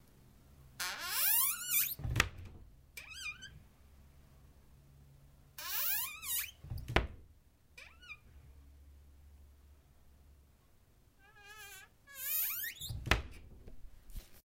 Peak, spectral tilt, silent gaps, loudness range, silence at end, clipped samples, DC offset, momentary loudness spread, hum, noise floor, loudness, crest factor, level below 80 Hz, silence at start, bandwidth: -10 dBFS; -2 dB/octave; none; 24 LU; 0.15 s; under 0.1%; under 0.1%; 25 LU; none; -66 dBFS; -35 LUFS; 30 dB; -52 dBFS; 0.15 s; 16 kHz